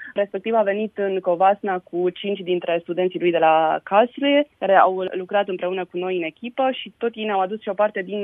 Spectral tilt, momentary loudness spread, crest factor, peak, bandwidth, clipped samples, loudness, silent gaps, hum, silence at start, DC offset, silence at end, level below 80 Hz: -8.5 dB/octave; 9 LU; 20 dB; -2 dBFS; 3.9 kHz; under 0.1%; -21 LUFS; none; none; 0 s; under 0.1%; 0 s; -74 dBFS